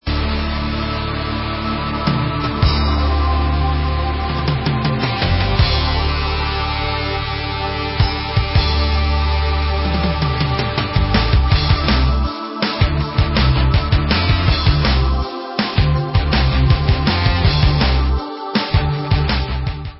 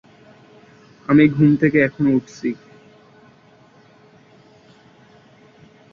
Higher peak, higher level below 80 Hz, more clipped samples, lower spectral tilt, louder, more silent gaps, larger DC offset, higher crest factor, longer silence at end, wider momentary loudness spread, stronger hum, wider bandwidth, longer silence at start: about the same, -2 dBFS vs -2 dBFS; first, -20 dBFS vs -58 dBFS; neither; first, -10 dB/octave vs -8.5 dB/octave; about the same, -17 LUFS vs -17 LUFS; neither; neither; second, 14 dB vs 20 dB; second, 0 s vs 3.4 s; second, 6 LU vs 15 LU; neither; second, 5.8 kHz vs 7 kHz; second, 0.05 s vs 1.1 s